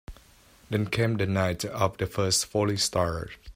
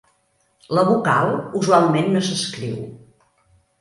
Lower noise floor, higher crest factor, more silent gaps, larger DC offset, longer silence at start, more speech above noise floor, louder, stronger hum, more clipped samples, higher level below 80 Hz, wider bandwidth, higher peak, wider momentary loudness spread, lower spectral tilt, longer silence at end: second, -56 dBFS vs -64 dBFS; about the same, 20 dB vs 18 dB; neither; neither; second, 0.1 s vs 0.7 s; second, 29 dB vs 46 dB; second, -27 LUFS vs -19 LUFS; neither; neither; first, -50 dBFS vs -60 dBFS; first, 16 kHz vs 11.5 kHz; second, -8 dBFS vs -2 dBFS; second, 6 LU vs 13 LU; second, -4 dB/octave vs -5.5 dB/octave; second, 0.05 s vs 0.85 s